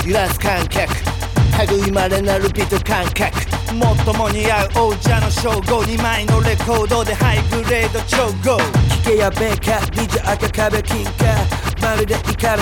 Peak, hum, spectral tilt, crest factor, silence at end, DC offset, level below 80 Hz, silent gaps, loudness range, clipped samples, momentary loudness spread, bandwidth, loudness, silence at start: -2 dBFS; none; -5 dB/octave; 14 dB; 0 s; under 0.1%; -24 dBFS; none; 1 LU; under 0.1%; 3 LU; 18.5 kHz; -17 LUFS; 0 s